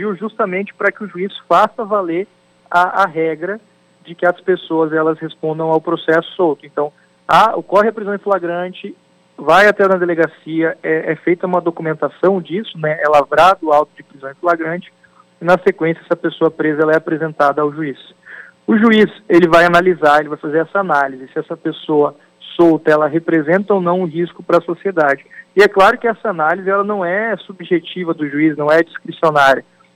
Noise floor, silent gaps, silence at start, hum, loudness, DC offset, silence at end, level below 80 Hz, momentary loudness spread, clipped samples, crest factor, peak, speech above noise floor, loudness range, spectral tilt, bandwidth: -38 dBFS; none; 0 s; none; -15 LUFS; under 0.1%; 0.35 s; -54 dBFS; 12 LU; under 0.1%; 14 dB; -2 dBFS; 23 dB; 4 LU; -6.5 dB/octave; 14 kHz